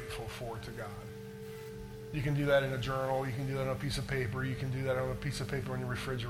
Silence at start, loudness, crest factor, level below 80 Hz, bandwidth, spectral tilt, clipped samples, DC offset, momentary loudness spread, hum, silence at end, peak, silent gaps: 0 s; -35 LUFS; 18 dB; -52 dBFS; 16.5 kHz; -6 dB/octave; under 0.1%; under 0.1%; 15 LU; none; 0 s; -16 dBFS; none